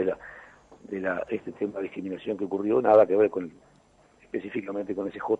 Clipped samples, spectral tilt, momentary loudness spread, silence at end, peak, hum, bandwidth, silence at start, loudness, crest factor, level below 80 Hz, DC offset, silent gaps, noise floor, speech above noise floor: under 0.1%; -8 dB/octave; 17 LU; 0.05 s; -6 dBFS; none; 7.8 kHz; 0 s; -27 LUFS; 22 dB; -66 dBFS; under 0.1%; none; -60 dBFS; 34 dB